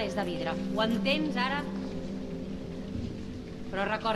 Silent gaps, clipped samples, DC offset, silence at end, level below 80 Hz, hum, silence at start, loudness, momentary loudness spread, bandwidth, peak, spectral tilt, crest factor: none; under 0.1%; under 0.1%; 0 s; -50 dBFS; none; 0 s; -32 LUFS; 11 LU; 13 kHz; -14 dBFS; -6 dB/octave; 18 dB